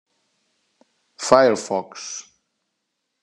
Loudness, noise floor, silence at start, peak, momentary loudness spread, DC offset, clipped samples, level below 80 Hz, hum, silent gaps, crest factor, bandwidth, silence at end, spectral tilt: -20 LUFS; -77 dBFS; 1.2 s; 0 dBFS; 17 LU; under 0.1%; under 0.1%; -66 dBFS; none; none; 24 dB; 11.5 kHz; 1 s; -3.5 dB/octave